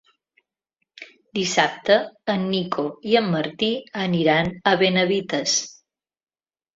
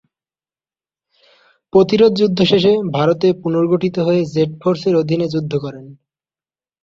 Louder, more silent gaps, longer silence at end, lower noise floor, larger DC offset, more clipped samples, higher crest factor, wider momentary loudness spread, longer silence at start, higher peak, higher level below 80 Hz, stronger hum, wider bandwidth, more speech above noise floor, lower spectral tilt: second, -21 LUFS vs -15 LUFS; neither; first, 1.05 s vs 0.9 s; second, -78 dBFS vs under -90 dBFS; neither; neither; about the same, 20 dB vs 16 dB; about the same, 8 LU vs 7 LU; second, 1 s vs 1.75 s; about the same, -2 dBFS vs -2 dBFS; second, -60 dBFS vs -54 dBFS; neither; about the same, 7.8 kHz vs 7.6 kHz; second, 57 dB vs over 75 dB; second, -4 dB/octave vs -7.5 dB/octave